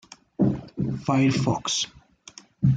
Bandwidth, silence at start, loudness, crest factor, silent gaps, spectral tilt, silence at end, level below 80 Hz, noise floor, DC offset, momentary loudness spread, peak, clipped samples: 9.2 kHz; 0.4 s; -25 LUFS; 16 dB; none; -5.5 dB/octave; 0 s; -50 dBFS; -50 dBFS; under 0.1%; 23 LU; -10 dBFS; under 0.1%